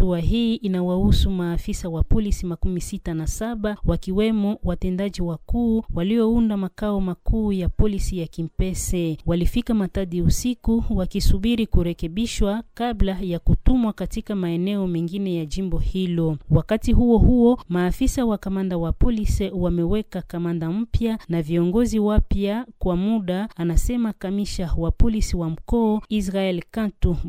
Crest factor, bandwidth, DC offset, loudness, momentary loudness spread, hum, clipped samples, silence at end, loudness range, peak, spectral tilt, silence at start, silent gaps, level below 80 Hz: 18 dB; 16 kHz; under 0.1%; -23 LUFS; 7 LU; none; under 0.1%; 0 s; 4 LU; -4 dBFS; -7 dB/octave; 0 s; none; -26 dBFS